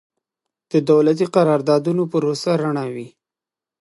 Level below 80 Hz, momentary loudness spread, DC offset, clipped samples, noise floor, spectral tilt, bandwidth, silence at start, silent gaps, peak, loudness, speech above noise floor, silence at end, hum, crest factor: -72 dBFS; 9 LU; under 0.1%; under 0.1%; -89 dBFS; -7 dB/octave; 11.5 kHz; 0.75 s; none; -2 dBFS; -18 LUFS; 72 dB; 0.75 s; none; 18 dB